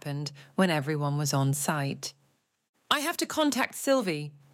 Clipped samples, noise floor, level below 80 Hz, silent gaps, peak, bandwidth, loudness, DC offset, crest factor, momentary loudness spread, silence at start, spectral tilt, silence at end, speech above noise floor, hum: under 0.1%; -71 dBFS; -76 dBFS; 2.69-2.74 s; -8 dBFS; 17 kHz; -28 LUFS; under 0.1%; 22 dB; 9 LU; 0.05 s; -4.5 dB/octave; 0.15 s; 42 dB; none